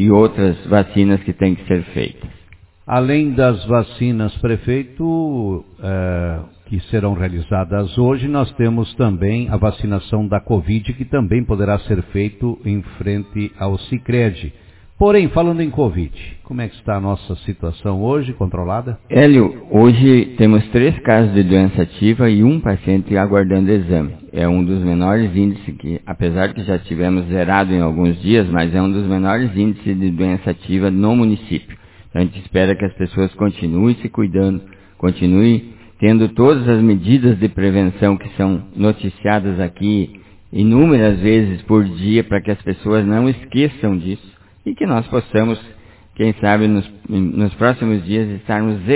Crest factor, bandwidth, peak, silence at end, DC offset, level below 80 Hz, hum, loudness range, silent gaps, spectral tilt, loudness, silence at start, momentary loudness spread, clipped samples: 16 dB; 4 kHz; 0 dBFS; 0 s; under 0.1%; -34 dBFS; none; 6 LU; none; -12 dB/octave; -16 LUFS; 0 s; 10 LU; under 0.1%